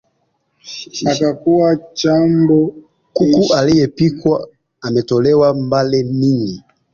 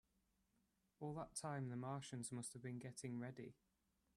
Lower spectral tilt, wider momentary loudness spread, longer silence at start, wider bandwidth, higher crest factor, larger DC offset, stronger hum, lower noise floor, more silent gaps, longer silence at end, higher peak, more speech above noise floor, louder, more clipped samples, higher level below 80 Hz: first, -6.5 dB/octave vs -5 dB/octave; first, 13 LU vs 6 LU; second, 0.65 s vs 1 s; second, 7.2 kHz vs 14 kHz; about the same, 14 dB vs 18 dB; neither; neither; second, -65 dBFS vs -84 dBFS; neither; second, 0.35 s vs 0.65 s; first, -2 dBFS vs -34 dBFS; first, 51 dB vs 34 dB; first, -14 LUFS vs -51 LUFS; neither; first, -48 dBFS vs -82 dBFS